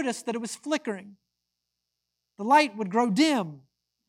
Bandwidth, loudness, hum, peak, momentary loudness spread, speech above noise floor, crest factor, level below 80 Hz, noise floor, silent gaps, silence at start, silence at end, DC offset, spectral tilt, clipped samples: 15 kHz; -26 LUFS; 60 Hz at -60 dBFS; -8 dBFS; 15 LU; 57 dB; 20 dB; -82 dBFS; -83 dBFS; none; 0 s; 0.5 s; under 0.1%; -4.5 dB/octave; under 0.1%